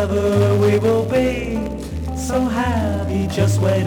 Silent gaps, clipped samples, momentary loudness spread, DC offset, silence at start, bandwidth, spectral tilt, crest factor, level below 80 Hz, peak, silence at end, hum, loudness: none; under 0.1%; 9 LU; under 0.1%; 0 s; 17.5 kHz; -7 dB/octave; 14 dB; -32 dBFS; -4 dBFS; 0 s; none; -19 LUFS